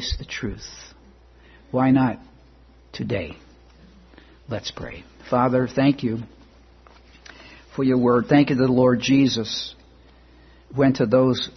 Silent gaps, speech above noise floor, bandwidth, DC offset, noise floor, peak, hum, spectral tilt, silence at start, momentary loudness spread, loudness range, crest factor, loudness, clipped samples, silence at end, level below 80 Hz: none; 31 dB; 6.4 kHz; under 0.1%; -51 dBFS; -4 dBFS; none; -6.5 dB/octave; 0 s; 19 LU; 7 LU; 18 dB; -21 LUFS; under 0.1%; 0.05 s; -46 dBFS